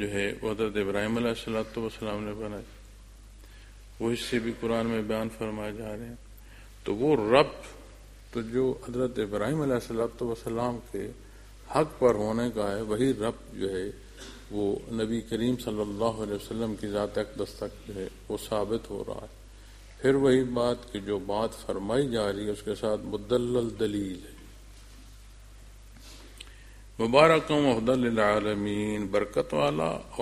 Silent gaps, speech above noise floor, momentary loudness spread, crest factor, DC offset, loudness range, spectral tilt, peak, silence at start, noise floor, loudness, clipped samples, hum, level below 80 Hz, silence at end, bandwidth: none; 21 dB; 15 LU; 26 dB; under 0.1%; 8 LU; -6 dB/octave; -4 dBFS; 0 s; -49 dBFS; -29 LUFS; under 0.1%; none; -50 dBFS; 0 s; 14.5 kHz